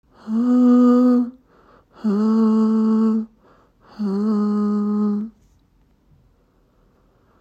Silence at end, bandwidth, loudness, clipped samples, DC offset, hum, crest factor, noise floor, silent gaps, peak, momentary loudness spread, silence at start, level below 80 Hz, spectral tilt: 2.1 s; 7.2 kHz; -18 LUFS; under 0.1%; under 0.1%; none; 14 dB; -59 dBFS; none; -6 dBFS; 13 LU; 0.25 s; -62 dBFS; -9.5 dB/octave